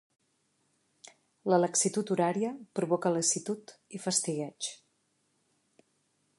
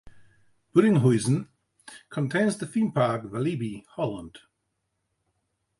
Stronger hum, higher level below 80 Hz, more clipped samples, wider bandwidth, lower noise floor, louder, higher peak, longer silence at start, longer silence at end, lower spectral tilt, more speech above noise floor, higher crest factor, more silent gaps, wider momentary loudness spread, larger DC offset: neither; second, -82 dBFS vs -62 dBFS; neither; about the same, 11.5 kHz vs 11.5 kHz; about the same, -75 dBFS vs -78 dBFS; second, -30 LUFS vs -26 LUFS; second, -12 dBFS vs -8 dBFS; first, 1.45 s vs 0.05 s; first, 1.65 s vs 1.4 s; second, -4 dB/octave vs -7 dB/octave; second, 45 dB vs 53 dB; about the same, 20 dB vs 20 dB; neither; second, 12 LU vs 15 LU; neither